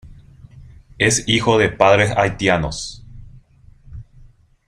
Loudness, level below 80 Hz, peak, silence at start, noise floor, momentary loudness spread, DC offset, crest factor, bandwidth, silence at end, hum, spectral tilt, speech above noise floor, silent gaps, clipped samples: -16 LUFS; -40 dBFS; 0 dBFS; 0.05 s; -48 dBFS; 11 LU; under 0.1%; 20 dB; 15 kHz; 0.65 s; none; -4 dB/octave; 31 dB; none; under 0.1%